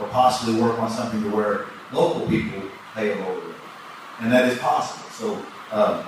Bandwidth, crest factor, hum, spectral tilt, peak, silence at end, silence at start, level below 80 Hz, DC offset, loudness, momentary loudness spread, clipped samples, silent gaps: 15.5 kHz; 18 dB; none; -5.5 dB/octave; -4 dBFS; 0 s; 0 s; -56 dBFS; under 0.1%; -23 LUFS; 15 LU; under 0.1%; none